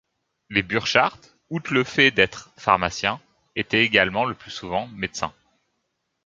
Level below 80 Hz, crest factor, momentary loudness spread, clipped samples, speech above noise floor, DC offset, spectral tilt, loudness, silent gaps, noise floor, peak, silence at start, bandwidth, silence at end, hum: -54 dBFS; 22 dB; 14 LU; under 0.1%; 54 dB; under 0.1%; -4 dB/octave; -22 LUFS; none; -76 dBFS; -2 dBFS; 0.5 s; 7.8 kHz; 0.95 s; none